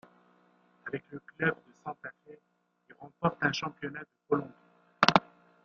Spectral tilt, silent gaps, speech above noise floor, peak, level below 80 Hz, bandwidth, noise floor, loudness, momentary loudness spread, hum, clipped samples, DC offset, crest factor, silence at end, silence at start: -2.5 dB/octave; none; 32 dB; -2 dBFS; -70 dBFS; 7.6 kHz; -66 dBFS; -31 LUFS; 22 LU; none; under 0.1%; under 0.1%; 32 dB; 0.4 s; 0.85 s